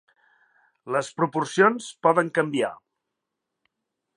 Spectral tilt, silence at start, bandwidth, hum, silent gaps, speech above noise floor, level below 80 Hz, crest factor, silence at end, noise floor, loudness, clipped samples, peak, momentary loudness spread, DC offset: -5 dB/octave; 0.85 s; 11 kHz; none; none; 60 dB; -80 dBFS; 22 dB; 1.4 s; -83 dBFS; -23 LUFS; under 0.1%; -4 dBFS; 8 LU; under 0.1%